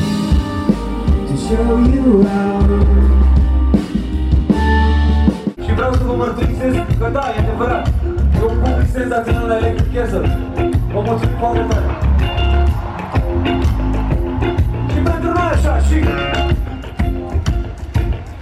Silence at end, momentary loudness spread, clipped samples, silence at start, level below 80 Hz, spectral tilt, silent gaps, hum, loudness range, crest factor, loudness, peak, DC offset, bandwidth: 0 s; 7 LU; under 0.1%; 0 s; -18 dBFS; -7.5 dB/octave; none; none; 3 LU; 12 dB; -16 LUFS; -2 dBFS; under 0.1%; 10 kHz